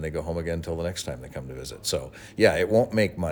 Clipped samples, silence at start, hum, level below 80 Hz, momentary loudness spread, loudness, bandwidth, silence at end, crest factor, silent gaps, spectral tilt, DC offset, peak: under 0.1%; 0 s; none; -48 dBFS; 15 LU; -26 LUFS; over 20 kHz; 0 s; 20 dB; none; -5 dB/octave; under 0.1%; -6 dBFS